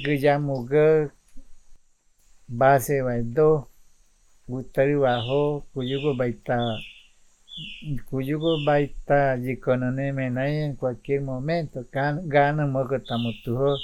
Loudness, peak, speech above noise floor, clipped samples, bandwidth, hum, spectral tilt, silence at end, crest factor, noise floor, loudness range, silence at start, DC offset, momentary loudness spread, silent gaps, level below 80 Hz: -24 LUFS; -6 dBFS; 36 dB; under 0.1%; 15.5 kHz; none; -7 dB/octave; 0 s; 18 dB; -59 dBFS; 3 LU; 0 s; under 0.1%; 12 LU; none; -48 dBFS